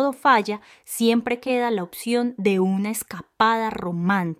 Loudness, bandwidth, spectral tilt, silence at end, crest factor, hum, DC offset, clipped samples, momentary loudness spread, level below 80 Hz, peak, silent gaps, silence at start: -22 LUFS; 16 kHz; -5 dB/octave; 0.05 s; 18 dB; none; under 0.1%; under 0.1%; 11 LU; -62 dBFS; -4 dBFS; none; 0 s